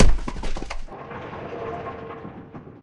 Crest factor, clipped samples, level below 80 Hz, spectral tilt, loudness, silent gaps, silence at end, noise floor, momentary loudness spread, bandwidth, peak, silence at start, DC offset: 20 dB; under 0.1%; -26 dBFS; -6 dB/octave; -32 LUFS; none; 0.05 s; -41 dBFS; 8 LU; 8.4 kHz; -2 dBFS; 0 s; under 0.1%